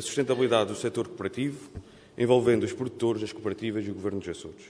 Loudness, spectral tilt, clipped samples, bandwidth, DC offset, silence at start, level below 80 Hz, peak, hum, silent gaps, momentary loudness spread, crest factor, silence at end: -28 LUFS; -5.5 dB/octave; under 0.1%; 11 kHz; under 0.1%; 0 s; -60 dBFS; -8 dBFS; none; none; 15 LU; 20 dB; 0 s